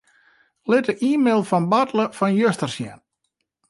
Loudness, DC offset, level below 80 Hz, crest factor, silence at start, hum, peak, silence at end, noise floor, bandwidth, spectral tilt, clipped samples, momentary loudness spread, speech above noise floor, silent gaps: -20 LUFS; under 0.1%; -68 dBFS; 16 dB; 0.65 s; none; -6 dBFS; 0.75 s; -76 dBFS; 11.5 kHz; -6 dB/octave; under 0.1%; 11 LU; 56 dB; none